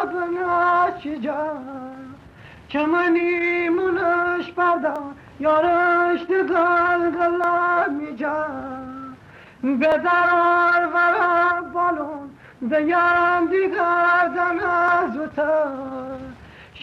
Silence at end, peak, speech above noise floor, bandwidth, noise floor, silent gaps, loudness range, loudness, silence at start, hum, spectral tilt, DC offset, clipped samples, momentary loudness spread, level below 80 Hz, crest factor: 0 s; -10 dBFS; 25 dB; 6.6 kHz; -45 dBFS; none; 3 LU; -20 LUFS; 0 s; none; -6.5 dB/octave; under 0.1%; under 0.1%; 15 LU; -56 dBFS; 12 dB